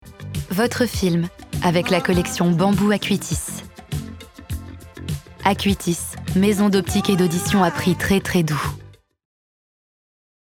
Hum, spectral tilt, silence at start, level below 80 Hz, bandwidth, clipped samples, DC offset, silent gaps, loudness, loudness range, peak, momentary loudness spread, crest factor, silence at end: none; -5 dB/octave; 0.05 s; -40 dBFS; 18.5 kHz; under 0.1%; under 0.1%; none; -20 LUFS; 4 LU; 0 dBFS; 15 LU; 20 dB; 1.55 s